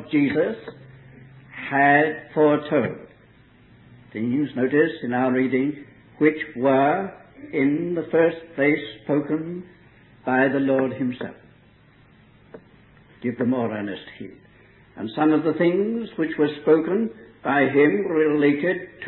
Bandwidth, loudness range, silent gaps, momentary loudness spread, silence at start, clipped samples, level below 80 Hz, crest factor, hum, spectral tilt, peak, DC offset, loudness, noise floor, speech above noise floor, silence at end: 4.2 kHz; 7 LU; none; 15 LU; 0 s; under 0.1%; -62 dBFS; 18 dB; none; -11 dB/octave; -4 dBFS; under 0.1%; -22 LUFS; -54 dBFS; 32 dB; 0 s